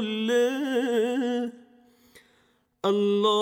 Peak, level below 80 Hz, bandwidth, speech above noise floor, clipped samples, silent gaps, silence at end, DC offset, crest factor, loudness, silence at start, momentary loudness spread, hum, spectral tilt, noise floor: -12 dBFS; -80 dBFS; 16.5 kHz; 43 dB; under 0.1%; none; 0 s; under 0.1%; 14 dB; -25 LUFS; 0 s; 8 LU; none; -5 dB/octave; -66 dBFS